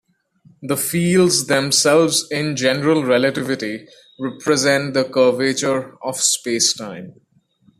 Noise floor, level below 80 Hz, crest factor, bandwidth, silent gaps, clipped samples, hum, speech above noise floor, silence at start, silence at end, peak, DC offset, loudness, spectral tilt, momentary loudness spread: -57 dBFS; -60 dBFS; 16 dB; 14.5 kHz; none; under 0.1%; none; 39 dB; 0.6 s; 0.7 s; -2 dBFS; under 0.1%; -17 LUFS; -3.5 dB/octave; 13 LU